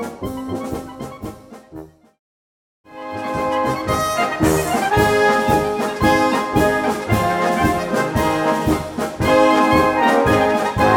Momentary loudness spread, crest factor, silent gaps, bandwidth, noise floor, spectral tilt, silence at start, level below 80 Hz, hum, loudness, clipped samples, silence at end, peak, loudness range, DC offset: 14 LU; 16 dB; 2.19-2.84 s; 19 kHz; -38 dBFS; -5.5 dB/octave; 0 s; -36 dBFS; none; -17 LUFS; under 0.1%; 0 s; -2 dBFS; 11 LU; under 0.1%